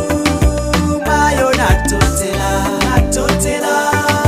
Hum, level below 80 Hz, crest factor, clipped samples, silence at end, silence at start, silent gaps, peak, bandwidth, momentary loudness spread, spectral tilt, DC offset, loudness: none; -22 dBFS; 14 dB; under 0.1%; 0 s; 0 s; none; 0 dBFS; 16 kHz; 3 LU; -4.5 dB/octave; under 0.1%; -14 LUFS